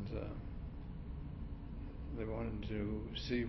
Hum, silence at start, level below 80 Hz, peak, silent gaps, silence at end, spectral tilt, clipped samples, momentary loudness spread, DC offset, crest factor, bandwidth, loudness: none; 0 s; -48 dBFS; -26 dBFS; none; 0 s; -6 dB/octave; under 0.1%; 8 LU; under 0.1%; 16 dB; 6 kHz; -45 LUFS